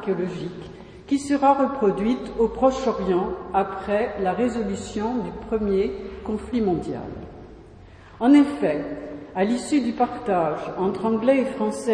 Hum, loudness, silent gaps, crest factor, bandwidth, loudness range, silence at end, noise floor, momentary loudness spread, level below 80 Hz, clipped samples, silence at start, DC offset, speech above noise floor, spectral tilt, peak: none; -23 LUFS; none; 18 dB; 10.5 kHz; 4 LU; 0 s; -45 dBFS; 14 LU; -46 dBFS; under 0.1%; 0 s; under 0.1%; 23 dB; -6.5 dB/octave; -6 dBFS